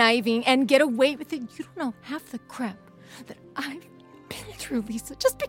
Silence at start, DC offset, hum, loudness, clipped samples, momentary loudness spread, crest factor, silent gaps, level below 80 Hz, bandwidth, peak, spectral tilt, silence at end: 0 s; under 0.1%; none; -26 LUFS; under 0.1%; 21 LU; 24 dB; none; -60 dBFS; 17 kHz; -2 dBFS; -3.5 dB/octave; 0 s